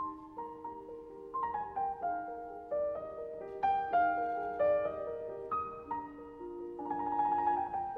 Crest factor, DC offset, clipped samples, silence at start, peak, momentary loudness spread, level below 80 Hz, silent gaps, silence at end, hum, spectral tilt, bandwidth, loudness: 16 dB; under 0.1%; under 0.1%; 0 s; -20 dBFS; 15 LU; -66 dBFS; none; 0 s; none; -8 dB/octave; 5.2 kHz; -36 LUFS